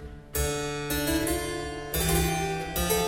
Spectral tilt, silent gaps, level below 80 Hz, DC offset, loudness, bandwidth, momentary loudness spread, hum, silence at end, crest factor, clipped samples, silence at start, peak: -4 dB/octave; none; -36 dBFS; under 0.1%; -28 LUFS; 17 kHz; 7 LU; none; 0 s; 16 dB; under 0.1%; 0 s; -12 dBFS